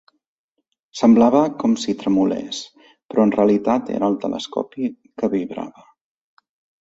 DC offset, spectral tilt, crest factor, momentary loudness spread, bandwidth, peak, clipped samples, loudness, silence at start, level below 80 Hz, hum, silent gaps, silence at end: under 0.1%; -6 dB/octave; 18 dB; 16 LU; 7.8 kHz; -2 dBFS; under 0.1%; -19 LUFS; 0.95 s; -60 dBFS; none; 3.05-3.09 s; 1.15 s